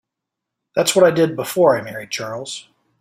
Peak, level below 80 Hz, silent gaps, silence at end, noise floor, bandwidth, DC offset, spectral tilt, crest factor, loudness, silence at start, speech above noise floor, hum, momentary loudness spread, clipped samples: 0 dBFS; -62 dBFS; none; 0.4 s; -82 dBFS; 16 kHz; under 0.1%; -4 dB/octave; 18 dB; -18 LUFS; 0.75 s; 65 dB; none; 15 LU; under 0.1%